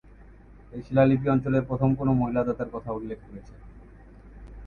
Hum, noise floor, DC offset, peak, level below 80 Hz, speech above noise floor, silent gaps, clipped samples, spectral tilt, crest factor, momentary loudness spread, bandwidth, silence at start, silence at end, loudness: none; -50 dBFS; under 0.1%; -8 dBFS; -46 dBFS; 25 dB; none; under 0.1%; -10.5 dB/octave; 18 dB; 21 LU; 4.7 kHz; 0.2 s; 0 s; -25 LUFS